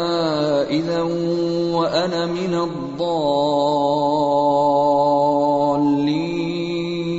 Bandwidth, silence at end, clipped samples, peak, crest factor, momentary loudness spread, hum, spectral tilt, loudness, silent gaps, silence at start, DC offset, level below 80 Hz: 8 kHz; 0 s; under 0.1%; -6 dBFS; 12 dB; 7 LU; none; -6.5 dB/octave; -19 LUFS; none; 0 s; under 0.1%; -54 dBFS